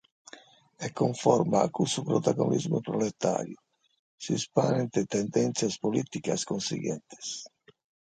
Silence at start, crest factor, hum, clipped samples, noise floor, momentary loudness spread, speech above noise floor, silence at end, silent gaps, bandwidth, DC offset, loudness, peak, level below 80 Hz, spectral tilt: 0.35 s; 22 dB; none; under 0.1%; -54 dBFS; 12 LU; 26 dB; 0.65 s; 3.99-4.18 s; 9.4 kHz; under 0.1%; -29 LUFS; -8 dBFS; -68 dBFS; -5.5 dB/octave